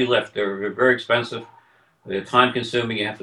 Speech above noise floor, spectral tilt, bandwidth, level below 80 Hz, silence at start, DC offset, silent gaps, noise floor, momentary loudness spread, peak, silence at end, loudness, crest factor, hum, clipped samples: 34 dB; -5 dB/octave; 11 kHz; -62 dBFS; 0 s; under 0.1%; none; -56 dBFS; 12 LU; -2 dBFS; 0.05 s; -21 LUFS; 20 dB; none; under 0.1%